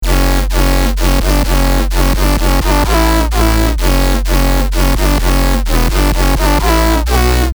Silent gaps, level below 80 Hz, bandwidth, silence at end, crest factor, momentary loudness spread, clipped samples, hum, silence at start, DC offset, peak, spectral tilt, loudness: none; -12 dBFS; over 20 kHz; 0 s; 8 dB; 2 LU; under 0.1%; none; 0 s; under 0.1%; -2 dBFS; -5 dB/octave; -13 LUFS